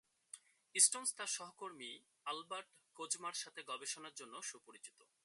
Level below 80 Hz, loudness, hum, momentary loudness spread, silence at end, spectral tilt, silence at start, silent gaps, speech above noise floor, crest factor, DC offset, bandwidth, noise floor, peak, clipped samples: under -90 dBFS; -39 LUFS; none; 26 LU; 0.35 s; 1 dB/octave; 0.35 s; none; 18 dB; 30 dB; under 0.1%; 12 kHz; -61 dBFS; -14 dBFS; under 0.1%